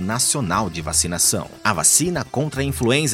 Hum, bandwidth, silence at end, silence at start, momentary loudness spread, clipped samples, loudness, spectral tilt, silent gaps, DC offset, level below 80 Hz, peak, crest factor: none; 16.5 kHz; 0 s; 0 s; 9 LU; under 0.1%; -18 LUFS; -3 dB/octave; none; under 0.1%; -42 dBFS; 0 dBFS; 20 dB